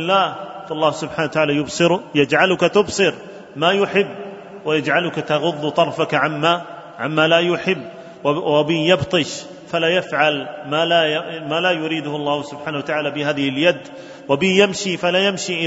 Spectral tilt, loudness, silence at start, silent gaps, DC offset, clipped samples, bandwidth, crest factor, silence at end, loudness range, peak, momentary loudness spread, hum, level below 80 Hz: -4.5 dB/octave; -18 LUFS; 0 s; none; under 0.1%; under 0.1%; 8 kHz; 18 dB; 0 s; 2 LU; 0 dBFS; 11 LU; none; -58 dBFS